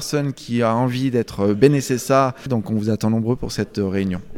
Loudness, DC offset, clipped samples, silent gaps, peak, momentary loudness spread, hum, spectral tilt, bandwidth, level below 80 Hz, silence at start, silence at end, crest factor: -20 LUFS; under 0.1%; under 0.1%; none; 0 dBFS; 7 LU; none; -6.5 dB/octave; 17 kHz; -44 dBFS; 0 s; 0 s; 20 dB